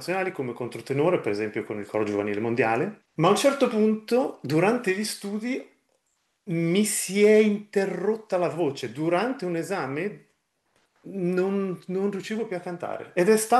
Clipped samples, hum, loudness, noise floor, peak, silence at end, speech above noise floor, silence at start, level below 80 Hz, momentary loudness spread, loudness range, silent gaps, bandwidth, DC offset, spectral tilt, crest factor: under 0.1%; none; -25 LUFS; -74 dBFS; -6 dBFS; 0 s; 49 dB; 0 s; -74 dBFS; 11 LU; 5 LU; none; 12.5 kHz; under 0.1%; -5 dB/octave; 18 dB